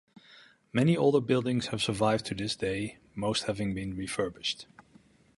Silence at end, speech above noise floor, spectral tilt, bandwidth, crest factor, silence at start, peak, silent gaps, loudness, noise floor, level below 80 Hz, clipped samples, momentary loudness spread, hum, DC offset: 0.75 s; 32 dB; -5.5 dB/octave; 11.5 kHz; 20 dB; 0.3 s; -10 dBFS; none; -30 LUFS; -61 dBFS; -58 dBFS; under 0.1%; 10 LU; none; under 0.1%